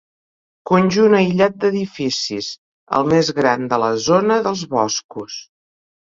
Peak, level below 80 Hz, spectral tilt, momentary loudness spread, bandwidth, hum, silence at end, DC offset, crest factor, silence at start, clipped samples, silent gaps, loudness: -2 dBFS; -56 dBFS; -5 dB/octave; 16 LU; 7.8 kHz; none; 0.6 s; under 0.1%; 16 dB; 0.65 s; under 0.1%; 2.58-2.87 s, 5.04-5.09 s; -17 LUFS